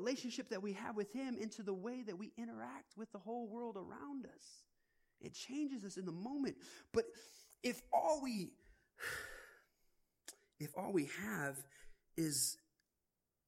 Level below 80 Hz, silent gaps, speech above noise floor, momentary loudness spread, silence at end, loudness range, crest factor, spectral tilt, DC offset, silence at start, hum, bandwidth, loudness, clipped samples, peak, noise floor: -74 dBFS; none; 46 dB; 19 LU; 0.9 s; 6 LU; 22 dB; -4 dB/octave; under 0.1%; 0 s; none; 16 kHz; -44 LUFS; under 0.1%; -24 dBFS; -89 dBFS